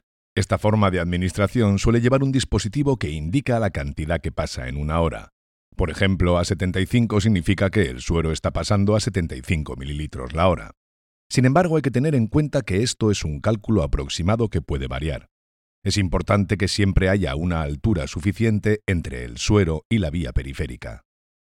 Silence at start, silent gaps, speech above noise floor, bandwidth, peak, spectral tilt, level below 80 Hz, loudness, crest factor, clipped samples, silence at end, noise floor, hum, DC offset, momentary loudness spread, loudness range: 0.35 s; 5.32-5.72 s, 10.77-11.30 s, 15.31-15.82 s, 19.85-19.90 s; over 69 dB; 12.5 kHz; -4 dBFS; -6 dB/octave; -34 dBFS; -22 LUFS; 18 dB; under 0.1%; 0.55 s; under -90 dBFS; none; under 0.1%; 9 LU; 3 LU